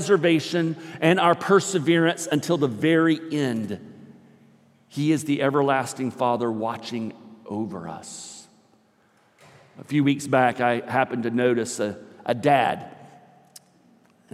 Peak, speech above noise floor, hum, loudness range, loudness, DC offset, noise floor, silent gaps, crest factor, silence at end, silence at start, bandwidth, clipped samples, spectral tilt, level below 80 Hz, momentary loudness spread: -4 dBFS; 39 dB; none; 9 LU; -23 LUFS; under 0.1%; -61 dBFS; none; 20 dB; 1.25 s; 0 s; 14.5 kHz; under 0.1%; -5.5 dB/octave; -76 dBFS; 16 LU